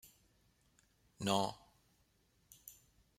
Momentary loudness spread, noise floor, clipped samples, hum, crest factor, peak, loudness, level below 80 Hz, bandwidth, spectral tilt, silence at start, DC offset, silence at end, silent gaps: 22 LU; -75 dBFS; under 0.1%; none; 26 dB; -18 dBFS; -38 LUFS; -76 dBFS; 16 kHz; -4 dB/octave; 0.05 s; under 0.1%; 0.45 s; none